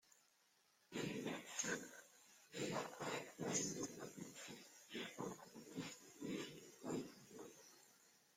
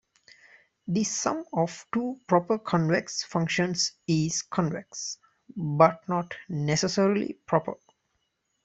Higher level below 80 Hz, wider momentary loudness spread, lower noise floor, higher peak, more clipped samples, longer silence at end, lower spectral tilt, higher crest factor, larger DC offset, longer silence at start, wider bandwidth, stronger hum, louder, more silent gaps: second, -84 dBFS vs -66 dBFS; first, 16 LU vs 12 LU; about the same, -78 dBFS vs -76 dBFS; second, -28 dBFS vs -4 dBFS; neither; second, 0.2 s vs 0.9 s; second, -3 dB/octave vs -4.5 dB/octave; about the same, 22 dB vs 24 dB; neither; second, 0.1 s vs 0.85 s; first, 16.5 kHz vs 8.2 kHz; neither; second, -49 LUFS vs -27 LUFS; neither